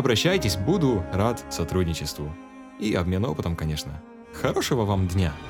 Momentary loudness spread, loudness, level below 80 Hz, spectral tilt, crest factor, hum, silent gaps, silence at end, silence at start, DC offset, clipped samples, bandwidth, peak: 14 LU; -25 LUFS; -42 dBFS; -5.5 dB/octave; 16 dB; none; none; 0 s; 0 s; under 0.1%; under 0.1%; 19 kHz; -8 dBFS